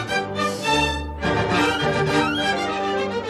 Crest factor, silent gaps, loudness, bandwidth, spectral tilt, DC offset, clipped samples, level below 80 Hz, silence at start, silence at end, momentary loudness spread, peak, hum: 14 dB; none; -21 LUFS; 14 kHz; -4.5 dB/octave; under 0.1%; under 0.1%; -40 dBFS; 0 s; 0 s; 4 LU; -8 dBFS; none